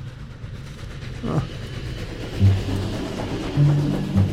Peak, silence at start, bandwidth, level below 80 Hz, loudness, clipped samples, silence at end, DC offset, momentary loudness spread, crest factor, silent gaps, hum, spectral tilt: -6 dBFS; 0 s; 11.5 kHz; -36 dBFS; -24 LUFS; under 0.1%; 0 s; under 0.1%; 17 LU; 16 dB; none; none; -7.5 dB/octave